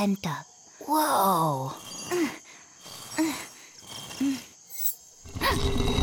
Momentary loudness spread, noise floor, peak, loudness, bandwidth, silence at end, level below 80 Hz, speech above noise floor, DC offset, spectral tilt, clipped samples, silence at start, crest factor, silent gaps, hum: 20 LU; -47 dBFS; -10 dBFS; -28 LUFS; 18 kHz; 0 s; -42 dBFS; 22 dB; under 0.1%; -4.5 dB/octave; under 0.1%; 0 s; 18 dB; none; none